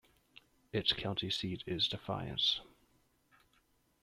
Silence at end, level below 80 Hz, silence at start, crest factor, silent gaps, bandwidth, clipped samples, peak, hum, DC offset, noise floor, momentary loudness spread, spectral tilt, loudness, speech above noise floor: 1.4 s; -64 dBFS; 0.75 s; 22 dB; none; 15 kHz; under 0.1%; -16 dBFS; none; under 0.1%; -73 dBFS; 7 LU; -4.5 dB/octave; -35 LUFS; 37 dB